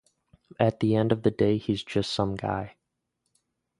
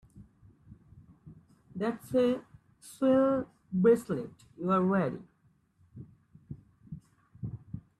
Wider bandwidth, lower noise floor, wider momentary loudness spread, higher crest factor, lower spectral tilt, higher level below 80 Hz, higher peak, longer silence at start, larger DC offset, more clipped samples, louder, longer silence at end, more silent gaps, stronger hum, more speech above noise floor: second, 11 kHz vs 13 kHz; first, -80 dBFS vs -69 dBFS; second, 8 LU vs 24 LU; about the same, 22 dB vs 18 dB; about the same, -7 dB/octave vs -8 dB/octave; first, -54 dBFS vs -64 dBFS; first, -6 dBFS vs -14 dBFS; first, 0.6 s vs 0.15 s; neither; neither; first, -26 LUFS vs -29 LUFS; first, 1.1 s vs 0.2 s; neither; neither; first, 54 dB vs 41 dB